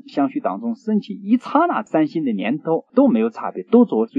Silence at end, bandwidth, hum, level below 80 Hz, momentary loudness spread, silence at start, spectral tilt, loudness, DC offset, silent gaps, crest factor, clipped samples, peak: 0 s; 7.4 kHz; none; -78 dBFS; 8 LU; 0.1 s; -8.5 dB/octave; -19 LUFS; under 0.1%; none; 18 dB; under 0.1%; -2 dBFS